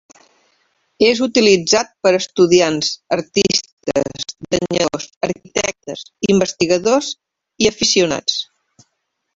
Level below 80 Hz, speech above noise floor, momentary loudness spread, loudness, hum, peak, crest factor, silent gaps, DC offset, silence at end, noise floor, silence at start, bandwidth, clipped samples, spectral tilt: -52 dBFS; 56 dB; 11 LU; -16 LUFS; none; 0 dBFS; 16 dB; 3.73-3.77 s, 5.16-5.21 s; under 0.1%; 0.95 s; -72 dBFS; 1 s; 8 kHz; under 0.1%; -3.5 dB/octave